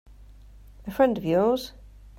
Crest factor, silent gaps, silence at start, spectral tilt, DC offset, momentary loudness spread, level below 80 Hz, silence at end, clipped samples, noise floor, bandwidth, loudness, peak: 18 dB; none; 0.2 s; -6.5 dB/octave; under 0.1%; 18 LU; -48 dBFS; 0.1 s; under 0.1%; -48 dBFS; 16 kHz; -24 LUFS; -8 dBFS